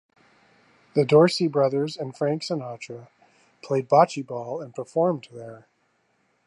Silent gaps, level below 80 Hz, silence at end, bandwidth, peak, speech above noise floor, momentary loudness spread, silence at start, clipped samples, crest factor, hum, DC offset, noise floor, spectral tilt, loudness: none; -76 dBFS; 0.9 s; 11.5 kHz; -4 dBFS; 45 dB; 21 LU; 0.95 s; under 0.1%; 20 dB; none; under 0.1%; -69 dBFS; -6.5 dB/octave; -23 LUFS